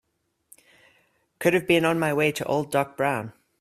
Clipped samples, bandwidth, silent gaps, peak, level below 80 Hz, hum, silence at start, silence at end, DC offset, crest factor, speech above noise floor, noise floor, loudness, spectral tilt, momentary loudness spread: under 0.1%; 15 kHz; none; -6 dBFS; -64 dBFS; none; 1.4 s; 0.3 s; under 0.1%; 20 dB; 52 dB; -75 dBFS; -24 LUFS; -5 dB/octave; 6 LU